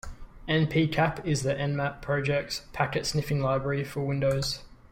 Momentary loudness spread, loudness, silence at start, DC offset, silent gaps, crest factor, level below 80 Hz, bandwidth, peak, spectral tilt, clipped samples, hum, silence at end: 6 LU; -28 LUFS; 0.05 s; under 0.1%; none; 18 dB; -48 dBFS; 16 kHz; -10 dBFS; -5.5 dB/octave; under 0.1%; none; 0.15 s